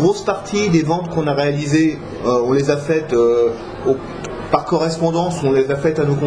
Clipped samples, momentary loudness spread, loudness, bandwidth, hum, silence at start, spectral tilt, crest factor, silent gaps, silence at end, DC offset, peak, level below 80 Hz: under 0.1%; 5 LU; -17 LUFS; 10.5 kHz; none; 0 s; -6.5 dB/octave; 16 dB; none; 0 s; under 0.1%; 0 dBFS; -44 dBFS